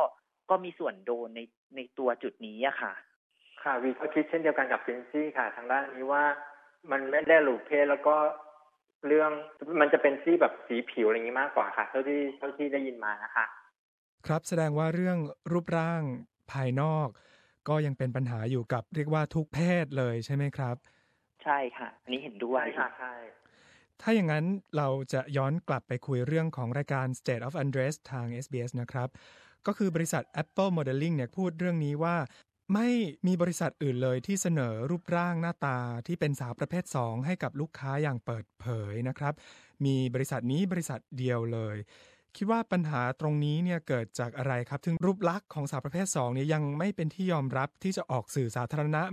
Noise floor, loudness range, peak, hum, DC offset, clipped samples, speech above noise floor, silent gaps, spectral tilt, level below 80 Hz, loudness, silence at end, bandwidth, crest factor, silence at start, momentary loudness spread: -63 dBFS; 6 LU; -8 dBFS; none; under 0.1%; under 0.1%; 33 dB; 1.57-1.70 s, 3.16-3.30 s, 8.95-9.01 s, 13.79-14.18 s; -6.5 dB/octave; -68 dBFS; -31 LUFS; 0 s; 14.5 kHz; 24 dB; 0 s; 10 LU